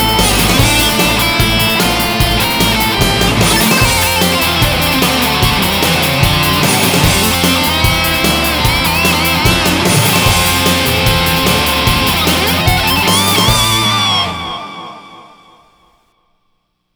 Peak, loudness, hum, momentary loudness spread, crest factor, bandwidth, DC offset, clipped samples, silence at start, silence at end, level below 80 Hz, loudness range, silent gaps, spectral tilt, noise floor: 0 dBFS; -10 LUFS; none; 2 LU; 12 dB; over 20 kHz; under 0.1%; under 0.1%; 0 s; 1.75 s; -24 dBFS; 2 LU; none; -3 dB/octave; -63 dBFS